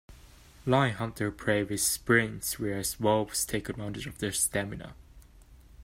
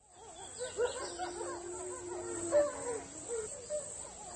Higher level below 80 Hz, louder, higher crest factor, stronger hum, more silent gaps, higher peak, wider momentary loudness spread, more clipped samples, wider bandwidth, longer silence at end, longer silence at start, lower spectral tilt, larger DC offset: first, -52 dBFS vs -64 dBFS; first, -29 LUFS vs -38 LUFS; about the same, 22 dB vs 20 dB; neither; neither; first, -10 dBFS vs -20 dBFS; about the same, 12 LU vs 11 LU; neither; first, 16 kHz vs 10 kHz; about the same, 0 s vs 0 s; about the same, 0.1 s vs 0.1 s; about the same, -4 dB/octave vs -3 dB/octave; neither